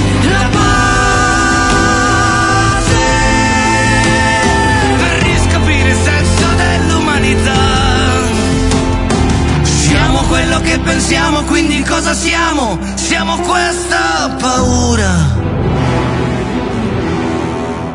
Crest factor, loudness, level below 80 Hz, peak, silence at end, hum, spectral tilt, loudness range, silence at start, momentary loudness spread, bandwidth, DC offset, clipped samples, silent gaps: 12 dB; -11 LUFS; -22 dBFS; 0 dBFS; 0 s; none; -4.5 dB/octave; 3 LU; 0 s; 5 LU; 11 kHz; under 0.1%; under 0.1%; none